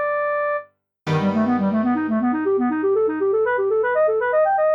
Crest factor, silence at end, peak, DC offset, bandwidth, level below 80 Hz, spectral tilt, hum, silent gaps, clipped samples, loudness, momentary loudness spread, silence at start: 10 dB; 0 s; -10 dBFS; under 0.1%; 7.2 kHz; -64 dBFS; -8.5 dB/octave; 50 Hz at -45 dBFS; none; under 0.1%; -20 LUFS; 4 LU; 0 s